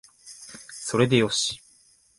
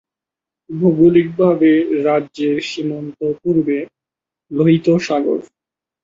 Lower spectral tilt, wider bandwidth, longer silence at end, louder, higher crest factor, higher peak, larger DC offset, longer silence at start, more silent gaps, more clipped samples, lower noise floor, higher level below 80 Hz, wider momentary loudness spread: second, -4 dB/octave vs -7.5 dB/octave; first, 11.5 kHz vs 7.6 kHz; about the same, 0.6 s vs 0.6 s; second, -23 LUFS vs -16 LUFS; first, 22 dB vs 16 dB; second, -6 dBFS vs -2 dBFS; neither; second, 0.25 s vs 0.7 s; neither; neither; second, -59 dBFS vs -87 dBFS; about the same, -60 dBFS vs -58 dBFS; first, 22 LU vs 11 LU